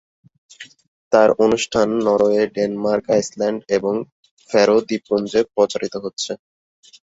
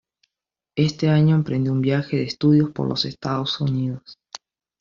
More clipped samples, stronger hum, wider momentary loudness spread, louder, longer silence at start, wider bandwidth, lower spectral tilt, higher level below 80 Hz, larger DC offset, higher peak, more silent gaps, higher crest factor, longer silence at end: neither; neither; second, 11 LU vs 19 LU; first, -18 LUFS vs -21 LUFS; second, 0.6 s vs 0.75 s; first, 8 kHz vs 7.2 kHz; second, -4.5 dB/octave vs -6.5 dB/octave; about the same, -56 dBFS vs -56 dBFS; neither; first, -2 dBFS vs -6 dBFS; first, 0.88-1.11 s, 4.12-4.23 s, 4.31-4.37 s, 6.13-6.17 s vs none; about the same, 18 dB vs 16 dB; about the same, 0.7 s vs 0.65 s